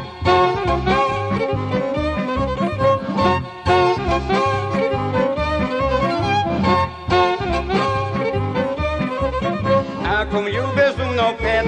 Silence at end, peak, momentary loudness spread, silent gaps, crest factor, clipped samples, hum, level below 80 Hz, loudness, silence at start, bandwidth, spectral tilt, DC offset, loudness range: 0 s; -4 dBFS; 5 LU; none; 14 dB; under 0.1%; none; -34 dBFS; -19 LUFS; 0 s; 9.8 kHz; -6.5 dB/octave; under 0.1%; 1 LU